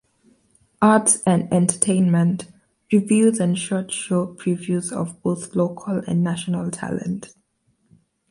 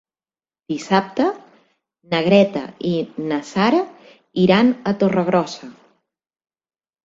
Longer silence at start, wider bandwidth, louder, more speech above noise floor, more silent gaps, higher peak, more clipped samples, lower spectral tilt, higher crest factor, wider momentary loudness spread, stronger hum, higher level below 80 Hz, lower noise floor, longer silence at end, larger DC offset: about the same, 0.8 s vs 0.7 s; first, 11.5 kHz vs 7.8 kHz; about the same, -21 LUFS vs -19 LUFS; second, 47 dB vs over 72 dB; neither; about the same, 0 dBFS vs -2 dBFS; neither; about the same, -5.5 dB/octave vs -6.5 dB/octave; about the same, 20 dB vs 18 dB; second, 11 LU vs 14 LU; neither; about the same, -60 dBFS vs -60 dBFS; second, -67 dBFS vs under -90 dBFS; second, 1.05 s vs 1.3 s; neither